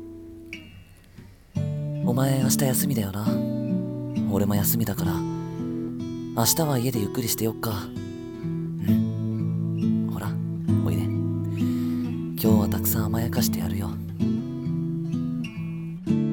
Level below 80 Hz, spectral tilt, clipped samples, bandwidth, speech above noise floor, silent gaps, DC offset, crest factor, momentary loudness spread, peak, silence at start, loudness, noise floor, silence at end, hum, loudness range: -52 dBFS; -5.5 dB/octave; under 0.1%; 18 kHz; 24 dB; none; under 0.1%; 18 dB; 10 LU; -8 dBFS; 0 s; -26 LUFS; -48 dBFS; 0 s; none; 2 LU